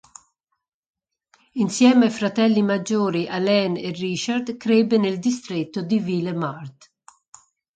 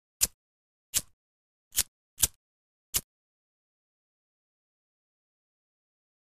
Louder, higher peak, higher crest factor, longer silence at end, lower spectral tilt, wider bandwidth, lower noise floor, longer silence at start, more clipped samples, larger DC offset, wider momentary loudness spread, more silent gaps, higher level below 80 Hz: first, -21 LUFS vs -30 LUFS; about the same, -4 dBFS vs -2 dBFS; second, 18 dB vs 36 dB; second, 1.05 s vs 3.25 s; first, -5.5 dB/octave vs 0.5 dB/octave; second, 9.2 kHz vs 15.5 kHz; second, -66 dBFS vs under -90 dBFS; first, 1.55 s vs 0.2 s; neither; neither; first, 10 LU vs 4 LU; second, none vs 0.34-0.93 s, 1.13-1.71 s, 1.88-2.17 s, 2.36-2.93 s; second, -68 dBFS vs -56 dBFS